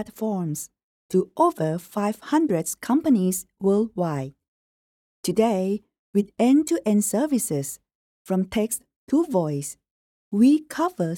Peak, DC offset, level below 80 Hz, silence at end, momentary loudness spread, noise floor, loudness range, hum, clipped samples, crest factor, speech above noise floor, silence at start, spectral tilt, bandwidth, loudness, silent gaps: -8 dBFS; under 0.1%; -62 dBFS; 0 s; 12 LU; under -90 dBFS; 2 LU; none; under 0.1%; 16 dB; over 68 dB; 0 s; -6 dB/octave; 18 kHz; -24 LUFS; 0.83-1.09 s, 4.48-5.23 s, 5.99-6.13 s, 7.95-8.25 s, 8.96-9.07 s, 9.91-10.31 s